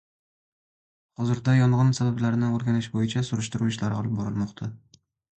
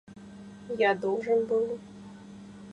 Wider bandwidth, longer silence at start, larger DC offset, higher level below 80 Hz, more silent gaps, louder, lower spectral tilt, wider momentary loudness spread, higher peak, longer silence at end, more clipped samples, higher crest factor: about the same, 8.8 kHz vs 9.2 kHz; first, 1.2 s vs 0.1 s; neither; first, -56 dBFS vs -68 dBFS; neither; first, -25 LUFS vs -28 LUFS; about the same, -6.5 dB/octave vs -6 dB/octave; second, 10 LU vs 21 LU; first, -8 dBFS vs -12 dBFS; first, 0.65 s vs 0 s; neither; about the same, 16 dB vs 18 dB